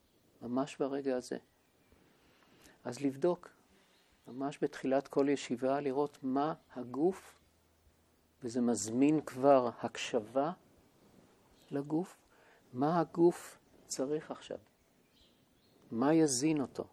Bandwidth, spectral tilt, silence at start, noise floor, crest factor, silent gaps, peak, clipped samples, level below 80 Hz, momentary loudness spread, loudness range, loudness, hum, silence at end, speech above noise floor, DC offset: 14 kHz; -5.5 dB/octave; 0.4 s; -70 dBFS; 22 dB; none; -14 dBFS; under 0.1%; -76 dBFS; 17 LU; 7 LU; -34 LUFS; none; 0.05 s; 37 dB; under 0.1%